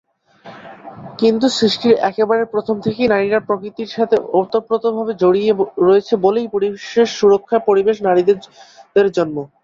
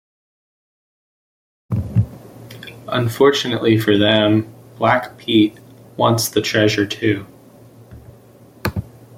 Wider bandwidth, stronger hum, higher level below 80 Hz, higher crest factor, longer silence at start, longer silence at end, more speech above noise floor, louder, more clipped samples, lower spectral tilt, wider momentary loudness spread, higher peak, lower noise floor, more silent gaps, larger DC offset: second, 7.8 kHz vs 16.5 kHz; neither; second, -58 dBFS vs -48 dBFS; about the same, 14 dB vs 18 dB; second, 0.45 s vs 1.7 s; second, 0.2 s vs 0.35 s; about the same, 26 dB vs 29 dB; about the same, -16 LUFS vs -17 LUFS; neither; about the same, -5.5 dB/octave vs -5.5 dB/octave; second, 8 LU vs 16 LU; about the same, -2 dBFS vs 0 dBFS; second, -41 dBFS vs -45 dBFS; neither; neither